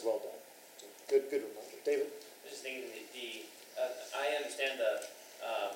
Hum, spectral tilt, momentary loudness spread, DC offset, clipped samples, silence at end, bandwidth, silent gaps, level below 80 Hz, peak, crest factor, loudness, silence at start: none; -1 dB/octave; 16 LU; under 0.1%; under 0.1%; 0 s; 16 kHz; none; under -90 dBFS; -18 dBFS; 20 dB; -38 LUFS; 0 s